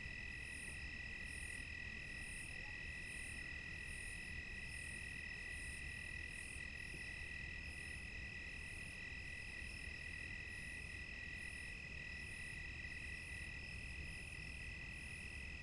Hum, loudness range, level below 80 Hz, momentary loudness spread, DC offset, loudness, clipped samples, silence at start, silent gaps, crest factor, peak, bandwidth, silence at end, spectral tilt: none; 1 LU; -56 dBFS; 2 LU; under 0.1%; -48 LUFS; under 0.1%; 0 s; none; 12 dB; -36 dBFS; 11.5 kHz; 0 s; -3 dB/octave